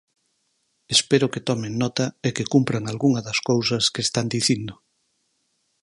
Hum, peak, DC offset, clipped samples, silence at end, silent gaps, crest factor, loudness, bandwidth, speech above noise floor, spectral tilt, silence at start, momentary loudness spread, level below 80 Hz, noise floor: none; -2 dBFS; under 0.1%; under 0.1%; 1.1 s; none; 22 dB; -22 LUFS; 11.5 kHz; 49 dB; -4 dB/octave; 0.9 s; 6 LU; -60 dBFS; -71 dBFS